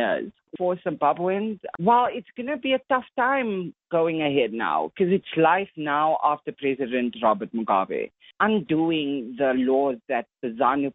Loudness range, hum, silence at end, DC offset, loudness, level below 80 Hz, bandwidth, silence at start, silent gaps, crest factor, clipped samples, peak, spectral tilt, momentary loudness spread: 1 LU; none; 0.05 s; under 0.1%; -24 LUFS; -68 dBFS; 4 kHz; 0 s; none; 18 dB; under 0.1%; -6 dBFS; -4 dB/octave; 8 LU